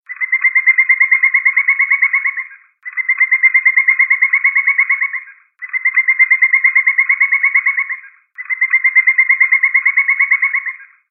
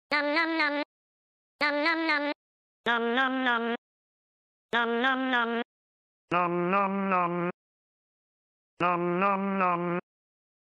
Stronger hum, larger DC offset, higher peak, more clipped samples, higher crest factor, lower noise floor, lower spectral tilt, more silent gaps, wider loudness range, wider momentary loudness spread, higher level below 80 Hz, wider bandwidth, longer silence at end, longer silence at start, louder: neither; neither; first, 0 dBFS vs -14 dBFS; neither; about the same, 12 dB vs 16 dB; second, -34 dBFS vs under -90 dBFS; second, 25 dB/octave vs -6.5 dB/octave; second, none vs 0.85-1.59 s, 2.35-2.84 s, 3.78-4.69 s, 5.65-6.28 s, 7.54-8.77 s; about the same, 1 LU vs 2 LU; first, 13 LU vs 9 LU; second, under -90 dBFS vs -76 dBFS; second, 2.7 kHz vs 9.4 kHz; second, 0.25 s vs 0.65 s; about the same, 0.1 s vs 0.1 s; first, -11 LUFS vs -28 LUFS